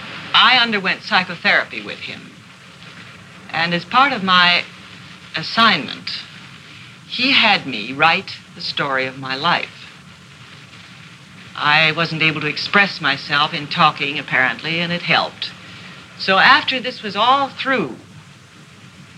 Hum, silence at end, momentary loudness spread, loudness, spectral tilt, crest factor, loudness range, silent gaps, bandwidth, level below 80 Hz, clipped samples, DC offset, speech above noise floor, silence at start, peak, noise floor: none; 0.15 s; 23 LU; -16 LUFS; -4 dB/octave; 20 dB; 4 LU; none; 12.5 kHz; -64 dBFS; under 0.1%; under 0.1%; 26 dB; 0 s; 0 dBFS; -43 dBFS